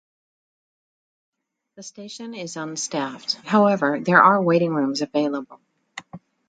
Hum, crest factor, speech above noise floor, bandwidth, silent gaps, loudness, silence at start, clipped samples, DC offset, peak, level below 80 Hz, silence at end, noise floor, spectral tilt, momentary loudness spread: none; 22 dB; 22 dB; 9.2 kHz; none; -20 LUFS; 1.8 s; under 0.1%; under 0.1%; 0 dBFS; -72 dBFS; 0.3 s; -43 dBFS; -4.5 dB/octave; 24 LU